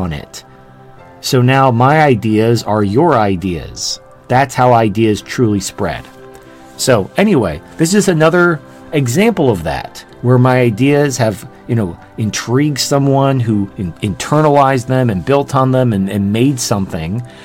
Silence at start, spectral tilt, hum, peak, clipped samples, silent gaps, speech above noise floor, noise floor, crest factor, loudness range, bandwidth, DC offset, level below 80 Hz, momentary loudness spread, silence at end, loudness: 0 s; -6 dB/octave; none; 0 dBFS; under 0.1%; none; 26 dB; -39 dBFS; 14 dB; 3 LU; 17 kHz; under 0.1%; -42 dBFS; 11 LU; 0 s; -13 LUFS